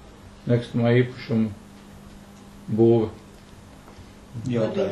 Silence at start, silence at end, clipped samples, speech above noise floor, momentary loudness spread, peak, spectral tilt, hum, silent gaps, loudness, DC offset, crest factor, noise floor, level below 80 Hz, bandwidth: 0.25 s; 0 s; under 0.1%; 24 dB; 26 LU; -6 dBFS; -8.5 dB/octave; 50 Hz at -50 dBFS; none; -23 LUFS; under 0.1%; 18 dB; -46 dBFS; -52 dBFS; 11.5 kHz